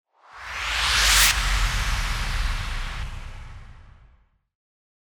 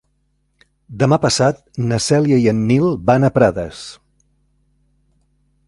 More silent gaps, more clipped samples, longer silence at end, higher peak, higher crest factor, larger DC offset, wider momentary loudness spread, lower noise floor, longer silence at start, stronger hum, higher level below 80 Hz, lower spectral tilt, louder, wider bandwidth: neither; neither; second, 1.1 s vs 1.75 s; second, -4 dBFS vs 0 dBFS; about the same, 22 dB vs 18 dB; neither; first, 23 LU vs 12 LU; second, -59 dBFS vs -65 dBFS; second, 0.35 s vs 0.9 s; neither; first, -30 dBFS vs -46 dBFS; second, -0.5 dB/octave vs -6 dB/octave; second, -22 LUFS vs -16 LUFS; first, 19.5 kHz vs 11.5 kHz